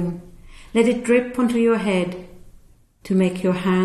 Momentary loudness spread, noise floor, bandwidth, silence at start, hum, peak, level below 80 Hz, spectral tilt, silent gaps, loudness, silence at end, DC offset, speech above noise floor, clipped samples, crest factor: 10 LU; -50 dBFS; 13 kHz; 0 s; none; -4 dBFS; -48 dBFS; -6.5 dB/octave; none; -20 LUFS; 0 s; under 0.1%; 30 dB; under 0.1%; 16 dB